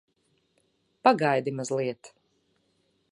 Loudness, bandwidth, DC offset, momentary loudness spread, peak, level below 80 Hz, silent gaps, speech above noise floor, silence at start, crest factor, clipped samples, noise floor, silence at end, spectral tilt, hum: -26 LUFS; 11.5 kHz; under 0.1%; 11 LU; -6 dBFS; -80 dBFS; none; 46 dB; 1.05 s; 24 dB; under 0.1%; -71 dBFS; 1.05 s; -5.5 dB/octave; none